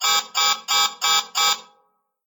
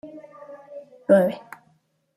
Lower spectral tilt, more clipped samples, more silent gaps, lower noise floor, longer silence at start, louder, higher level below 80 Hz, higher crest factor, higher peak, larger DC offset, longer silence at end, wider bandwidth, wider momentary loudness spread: second, 3.5 dB/octave vs -8 dB/octave; neither; neither; about the same, -66 dBFS vs -65 dBFS; about the same, 0 s vs 0.05 s; about the same, -19 LUFS vs -21 LUFS; second, -82 dBFS vs -70 dBFS; about the same, 16 dB vs 20 dB; about the same, -6 dBFS vs -6 dBFS; neither; second, 0.65 s vs 0.8 s; first, 19.5 kHz vs 13.5 kHz; second, 2 LU vs 25 LU